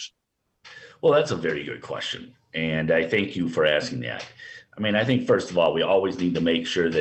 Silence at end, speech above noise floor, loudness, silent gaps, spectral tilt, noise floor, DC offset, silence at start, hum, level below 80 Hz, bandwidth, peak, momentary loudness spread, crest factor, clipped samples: 0 s; 53 dB; -24 LUFS; none; -5.5 dB/octave; -77 dBFS; under 0.1%; 0 s; none; -58 dBFS; 8.6 kHz; -8 dBFS; 13 LU; 16 dB; under 0.1%